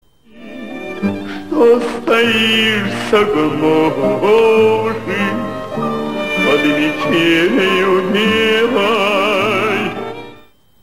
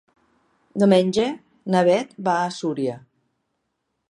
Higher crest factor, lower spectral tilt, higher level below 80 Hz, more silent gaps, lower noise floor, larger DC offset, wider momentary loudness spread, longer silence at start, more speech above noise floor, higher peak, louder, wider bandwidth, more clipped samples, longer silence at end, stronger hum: second, 14 dB vs 20 dB; about the same, -5 dB/octave vs -6 dB/octave; first, -48 dBFS vs -66 dBFS; neither; second, -45 dBFS vs -76 dBFS; first, 1% vs under 0.1%; second, 11 LU vs 14 LU; second, 0.35 s vs 0.75 s; second, 32 dB vs 56 dB; about the same, 0 dBFS vs -2 dBFS; first, -14 LUFS vs -21 LUFS; first, 16 kHz vs 11 kHz; neither; second, 0.5 s vs 1.1 s; neither